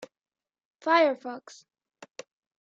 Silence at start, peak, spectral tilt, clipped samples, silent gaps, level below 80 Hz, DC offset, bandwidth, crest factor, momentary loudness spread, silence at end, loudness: 0 s; -10 dBFS; -2.5 dB/octave; under 0.1%; 0.65-0.71 s; under -90 dBFS; under 0.1%; 7.8 kHz; 22 dB; 24 LU; 1.25 s; -25 LUFS